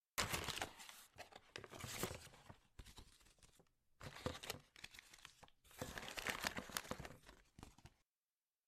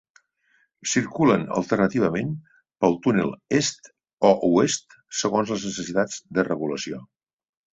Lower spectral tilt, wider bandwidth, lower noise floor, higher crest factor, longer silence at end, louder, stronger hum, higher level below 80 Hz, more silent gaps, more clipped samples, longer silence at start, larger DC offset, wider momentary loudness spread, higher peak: second, -2.5 dB/octave vs -4.5 dB/octave; first, 15.5 kHz vs 8.4 kHz; first, under -90 dBFS vs -66 dBFS; first, 32 dB vs 22 dB; about the same, 0.8 s vs 0.7 s; second, -49 LUFS vs -23 LUFS; neither; second, -68 dBFS vs -60 dBFS; second, none vs 4.13-4.17 s; neither; second, 0.15 s vs 0.85 s; neither; first, 21 LU vs 11 LU; second, -20 dBFS vs -2 dBFS